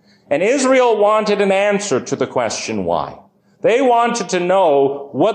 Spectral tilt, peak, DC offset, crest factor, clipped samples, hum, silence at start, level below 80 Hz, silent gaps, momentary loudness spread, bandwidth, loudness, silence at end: -4 dB/octave; -4 dBFS; under 0.1%; 12 dB; under 0.1%; none; 0.3 s; -56 dBFS; none; 7 LU; 9.8 kHz; -16 LUFS; 0 s